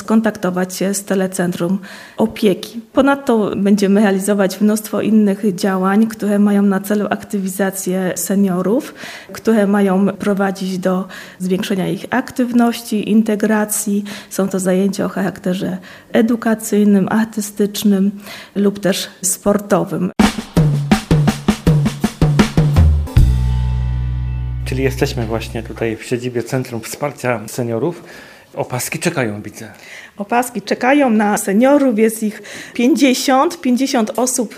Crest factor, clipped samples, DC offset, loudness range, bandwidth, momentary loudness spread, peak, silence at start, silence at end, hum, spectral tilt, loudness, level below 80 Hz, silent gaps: 16 dB; under 0.1%; under 0.1%; 6 LU; 15.5 kHz; 10 LU; 0 dBFS; 0 s; 0 s; none; -5.5 dB/octave; -16 LUFS; -28 dBFS; none